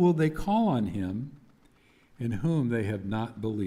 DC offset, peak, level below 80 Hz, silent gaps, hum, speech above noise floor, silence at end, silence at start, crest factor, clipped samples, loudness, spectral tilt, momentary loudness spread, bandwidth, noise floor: under 0.1%; -12 dBFS; -50 dBFS; none; none; 34 dB; 0 s; 0 s; 16 dB; under 0.1%; -29 LUFS; -8.5 dB/octave; 10 LU; 14 kHz; -61 dBFS